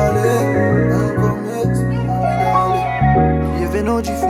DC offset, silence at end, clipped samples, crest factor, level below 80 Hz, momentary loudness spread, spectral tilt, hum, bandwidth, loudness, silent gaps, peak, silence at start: under 0.1%; 0 s; under 0.1%; 12 dB; -30 dBFS; 4 LU; -7.5 dB/octave; none; 15.5 kHz; -16 LUFS; none; -2 dBFS; 0 s